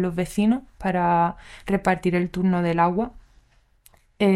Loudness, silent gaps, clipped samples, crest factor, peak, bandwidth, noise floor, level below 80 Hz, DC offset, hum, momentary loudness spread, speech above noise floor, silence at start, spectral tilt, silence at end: -23 LUFS; none; under 0.1%; 16 dB; -6 dBFS; 13.5 kHz; -58 dBFS; -48 dBFS; under 0.1%; none; 6 LU; 36 dB; 0 s; -7 dB/octave; 0 s